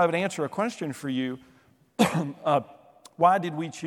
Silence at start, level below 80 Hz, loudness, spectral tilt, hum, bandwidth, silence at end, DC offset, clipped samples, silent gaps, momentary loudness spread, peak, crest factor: 0 s; -70 dBFS; -27 LUFS; -5.5 dB/octave; none; 17 kHz; 0 s; under 0.1%; under 0.1%; none; 12 LU; -6 dBFS; 20 dB